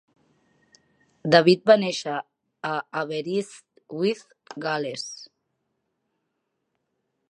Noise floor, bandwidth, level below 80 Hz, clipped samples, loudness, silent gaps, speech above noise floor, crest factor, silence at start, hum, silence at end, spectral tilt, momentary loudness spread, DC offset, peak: -78 dBFS; 10.5 kHz; -76 dBFS; under 0.1%; -24 LUFS; none; 55 dB; 26 dB; 1.25 s; none; 2.05 s; -5 dB/octave; 19 LU; under 0.1%; -2 dBFS